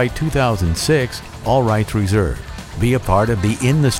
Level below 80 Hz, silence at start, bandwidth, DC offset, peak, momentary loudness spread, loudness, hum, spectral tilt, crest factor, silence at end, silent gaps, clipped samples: -30 dBFS; 0 s; 16.5 kHz; under 0.1%; -2 dBFS; 8 LU; -18 LUFS; none; -6 dB/octave; 14 dB; 0 s; none; under 0.1%